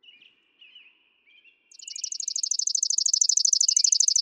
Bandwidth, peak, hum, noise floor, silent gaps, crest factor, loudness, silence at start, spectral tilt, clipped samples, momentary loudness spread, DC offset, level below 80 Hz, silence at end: 17 kHz; -8 dBFS; none; -61 dBFS; none; 18 dB; -21 LUFS; 0.75 s; 8.5 dB/octave; under 0.1%; 14 LU; under 0.1%; under -90 dBFS; 0 s